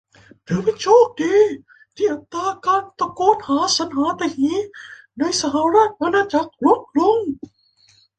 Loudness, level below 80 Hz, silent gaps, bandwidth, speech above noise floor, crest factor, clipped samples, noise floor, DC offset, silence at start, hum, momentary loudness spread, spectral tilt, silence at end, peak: -19 LUFS; -58 dBFS; none; 9.4 kHz; 38 dB; 18 dB; under 0.1%; -56 dBFS; under 0.1%; 0.5 s; none; 11 LU; -4 dB/octave; 0.85 s; -2 dBFS